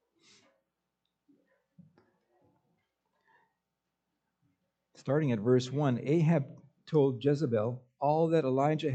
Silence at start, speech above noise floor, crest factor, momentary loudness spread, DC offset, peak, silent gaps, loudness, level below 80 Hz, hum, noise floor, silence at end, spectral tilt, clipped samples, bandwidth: 5.05 s; 57 dB; 18 dB; 6 LU; under 0.1%; -14 dBFS; none; -29 LUFS; -78 dBFS; none; -86 dBFS; 0 s; -8 dB/octave; under 0.1%; 8.2 kHz